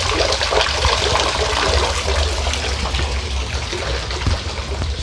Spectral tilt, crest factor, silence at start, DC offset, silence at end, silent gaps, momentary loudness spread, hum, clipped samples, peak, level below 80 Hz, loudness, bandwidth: -3 dB/octave; 18 dB; 0 s; under 0.1%; 0 s; none; 7 LU; none; under 0.1%; -2 dBFS; -24 dBFS; -19 LUFS; 11 kHz